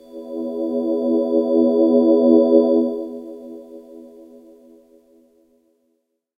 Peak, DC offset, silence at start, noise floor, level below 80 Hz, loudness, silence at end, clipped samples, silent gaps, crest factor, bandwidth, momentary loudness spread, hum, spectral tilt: -2 dBFS; under 0.1%; 0.15 s; -70 dBFS; -72 dBFS; -17 LUFS; 2.3 s; under 0.1%; none; 18 dB; 4.9 kHz; 23 LU; none; -8.5 dB/octave